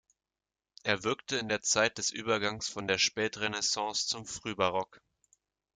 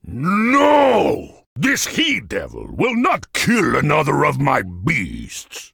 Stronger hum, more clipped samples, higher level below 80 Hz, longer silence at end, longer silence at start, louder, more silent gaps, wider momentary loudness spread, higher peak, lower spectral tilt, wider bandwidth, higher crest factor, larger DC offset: neither; neither; second, -68 dBFS vs -44 dBFS; first, 0.8 s vs 0.05 s; first, 0.85 s vs 0.05 s; second, -31 LUFS vs -17 LUFS; second, none vs 1.46-1.56 s; second, 8 LU vs 14 LU; second, -12 dBFS vs 0 dBFS; second, -2 dB/octave vs -4.5 dB/octave; second, 11 kHz vs 19.5 kHz; first, 22 dB vs 16 dB; neither